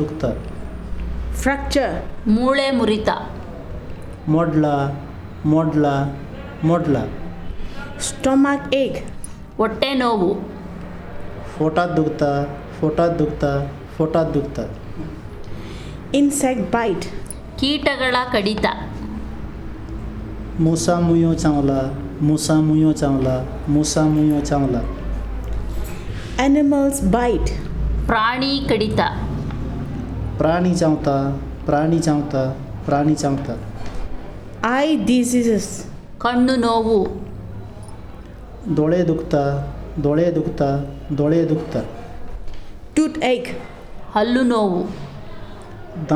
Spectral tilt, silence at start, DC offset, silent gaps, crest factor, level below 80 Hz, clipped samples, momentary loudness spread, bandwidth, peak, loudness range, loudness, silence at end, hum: -6 dB/octave; 0 s; under 0.1%; none; 18 dB; -32 dBFS; under 0.1%; 17 LU; 14.5 kHz; -2 dBFS; 4 LU; -20 LUFS; 0 s; none